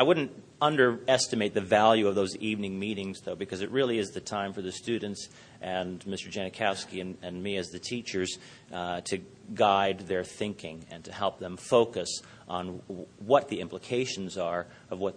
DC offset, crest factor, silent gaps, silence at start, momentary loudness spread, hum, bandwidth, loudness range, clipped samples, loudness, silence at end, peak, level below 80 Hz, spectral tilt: under 0.1%; 22 dB; none; 0 s; 15 LU; none; 10.5 kHz; 7 LU; under 0.1%; -30 LUFS; 0 s; -8 dBFS; -68 dBFS; -4 dB/octave